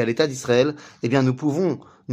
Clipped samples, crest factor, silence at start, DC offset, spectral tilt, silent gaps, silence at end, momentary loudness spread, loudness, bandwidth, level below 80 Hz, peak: under 0.1%; 16 dB; 0 s; under 0.1%; -6 dB/octave; none; 0 s; 7 LU; -22 LUFS; 15.5 kHz; -62 dBFS; -4 dBFS